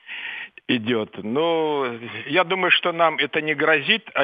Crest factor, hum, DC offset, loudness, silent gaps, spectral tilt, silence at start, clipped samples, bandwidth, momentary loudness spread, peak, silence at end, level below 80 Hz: 18 dB; none; under 0.1%; -21 LUFS; none; -7.5 dB/octave; 0.05 s; under 0.1%; 5 kHz; 13 LU; -4 dBFS; 0 s; -76 dBFS